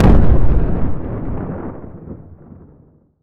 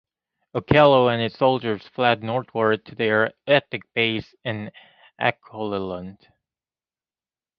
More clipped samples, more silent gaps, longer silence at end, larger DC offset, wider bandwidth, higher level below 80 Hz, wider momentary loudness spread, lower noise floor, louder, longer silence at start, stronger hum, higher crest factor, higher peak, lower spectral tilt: neither; neither; second, 1 s vs 1.45 s; neither; second, 4.6 kHz vs 6 kHz; first, -20 dBFS vs -54 dBFS; first, 22 LU vs 16 LU; second, -49 dBFS vs under -90 dBFS; first, -19 LUFS vs -22 LUFS; second, 0 s vs 0.55 s; neither; second, 14 dB vs 22 dB; about the same, 0 dBFS vs 0 dBFS; first, -10 dB/octave vs -8 dB/octave